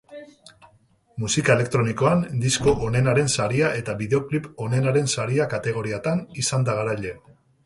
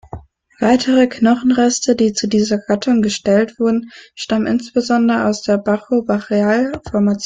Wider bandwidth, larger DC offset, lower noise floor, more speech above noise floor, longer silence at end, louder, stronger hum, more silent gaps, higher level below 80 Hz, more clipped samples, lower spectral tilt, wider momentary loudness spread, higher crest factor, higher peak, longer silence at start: first, 11.5 kHz vs 9.4 kHz; neither; first, -59 dBFS vs -35 dBFS; first, 37 dB vs 20 dB; first, 0.45 s vs 0 s; second, -22 LUFS vs -16 LUFS; neither; neither; about the same, -50 dBFS vs -50 dBFS; neither; about the same, -5 dB/octave vs -5 dB/octave; about the same, 8 LU vs 6 LU; first, 20 dB vs 14 dB; about the same, -2 dBFS vs -2 dBFS; about the same, 0.1 s vs 0.15 s